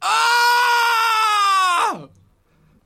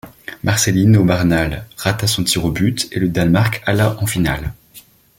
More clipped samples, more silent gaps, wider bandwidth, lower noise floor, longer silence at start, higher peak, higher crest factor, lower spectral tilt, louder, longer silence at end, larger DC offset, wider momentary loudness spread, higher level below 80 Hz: neither; neither; about the same, 16.5 kHz vs 17 kHz; first, -57 dBFS vs -45 dBFS; about the same, 0 s vs 0.05 s; second, -6 dBFS vs -2 dBFS; about the same, 12 dB vs 16 dB; second, 0.5 dB/octave vs -5 dB/octave; about the same, -16 LUFS vs -16 LUFS; first, 0.8 s vs 0.4 s; neither; second, 6 LU vs 10 LU; second, -64 dBFS vs -36 dBFS